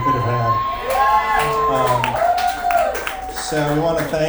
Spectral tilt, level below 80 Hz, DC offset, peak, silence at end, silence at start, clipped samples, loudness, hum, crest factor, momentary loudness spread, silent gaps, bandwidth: -5 dB/octave; -38 dBFS; under 0.1%; -2 dBFS; 0 s; 0 s; under 0.1%; -18 LUFS; none; 16 dB; 6 LU; none; over 20 kHz